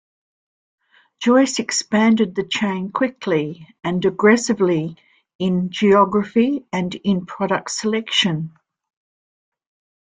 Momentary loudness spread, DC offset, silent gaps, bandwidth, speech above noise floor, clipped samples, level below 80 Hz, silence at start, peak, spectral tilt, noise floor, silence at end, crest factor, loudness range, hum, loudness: 9 LU; under 0.1%; 5.35-5.39 s; 9.6 kHz; over 72 dB; under 0.1%; -60 dBFS; 1.2 s; -2 dBFS; -4.5 dB/octave; under -90 dBFS; 1.6 s; 18 dB; 3 LU; none; -19 LUFS